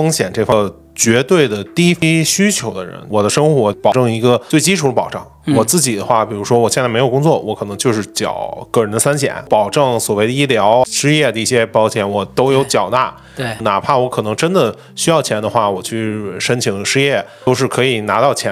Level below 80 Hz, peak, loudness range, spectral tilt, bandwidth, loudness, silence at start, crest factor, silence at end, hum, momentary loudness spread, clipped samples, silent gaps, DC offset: -50 dBFS; 0 dBFS; 2 LU; -4.5 dB/octave; 16.5 kHz; -14 LUFS; 0 s; 14 dB; 0 s; none; 7 LU; under 0.1%; none; under 0.1%